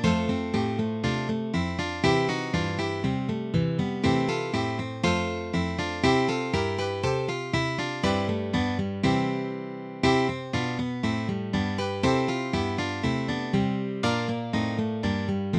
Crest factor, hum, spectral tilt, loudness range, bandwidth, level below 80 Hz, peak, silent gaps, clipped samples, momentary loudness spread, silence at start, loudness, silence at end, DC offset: 18 dB; none; -6 dB/octave; 1 LU; 10.5 kHz; -48 dBFS; -10 dBFS; none; under 0.1%; 5 LU; 0 s; -27 LUFS; 0 s; under 0.1%